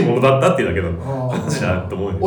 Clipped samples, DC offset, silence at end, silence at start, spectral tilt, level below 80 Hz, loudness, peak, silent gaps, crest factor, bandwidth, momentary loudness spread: under 0.1%; under 0.1%; 0 s; 0 s; -6.5 dB/octave; -40 dBFS; -18 LUFS; -4 dBFS; none; 14 dB; 19 kHz; 9 LU